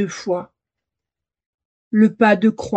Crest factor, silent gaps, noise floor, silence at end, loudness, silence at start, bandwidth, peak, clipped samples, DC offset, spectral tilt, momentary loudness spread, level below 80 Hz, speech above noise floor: 18 dB; 1.46-1.58 s, 1.65-1.91 s; -86 dBFS; 0 s; -17 LUFS; 0 s; 8.2 kHz; -2 dBFS; under 0.1%; under 0.1%; -6.5 dB/octave; 11 LU; -60 dBFS; 70 dB